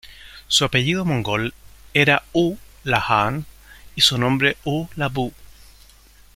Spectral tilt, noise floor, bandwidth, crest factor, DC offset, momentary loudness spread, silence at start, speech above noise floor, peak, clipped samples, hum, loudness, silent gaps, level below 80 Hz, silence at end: -4 dB/octave; -49 dBFS; 16.5 kHz; 22 dB; under 0.1%; 13 LU; 0.05 s; 29 dB; 0 dBFS; under 0.1%; none; -20 LUFS; none; -46 dBFS; 0.9 s